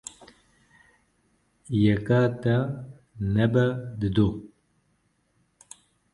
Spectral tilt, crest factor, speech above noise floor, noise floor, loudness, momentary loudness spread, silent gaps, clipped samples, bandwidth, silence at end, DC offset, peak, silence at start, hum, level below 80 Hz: -7.5 dB/octave; 18 dB; 46 dB; -69 dBFS; -25 LUFS; 16 LU; none; under 0.1%; 11.5 kHz; 1.65 s; under 0.1%; -8 dBFS; 1.7 s; none; -50 dBFS